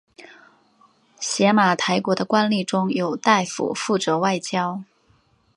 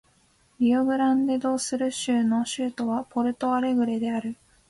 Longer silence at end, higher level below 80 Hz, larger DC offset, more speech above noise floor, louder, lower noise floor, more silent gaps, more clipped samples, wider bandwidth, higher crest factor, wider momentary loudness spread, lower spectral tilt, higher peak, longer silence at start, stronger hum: first, 0.75 s vs 0.35 s; about the same, -70 dBFS vs -66 dBFS; neither; about the same, 40 dB vs 39 dB; first, -21 LUFS vs -25 LUFS; about the same, -61 dBFS vs -63 dBFS; neither; neither; about the same, 11.5 kHz vs 11.5 kHz; first, 20 dB vs 12 dB; about the same, 8 LU vs 6 LU; about the same, -4.5 dB/octave vs -4 dB/octave; first, -2 dBFS vs -12 dBFS; second, 0.2 s vs 0.6 s; neither